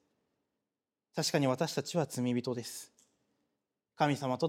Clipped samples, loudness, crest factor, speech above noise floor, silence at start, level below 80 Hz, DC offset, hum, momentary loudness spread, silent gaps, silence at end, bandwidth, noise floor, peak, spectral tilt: under 0.1%; -34 LUFS; 22 dB; over 57 dB; 1.15 s; -80 dBFS; under 0.1%; none; 13 LU; none; 0 s; 16.5 kHz; under -90 dBFS; -14 dBFS; -5 dB/octave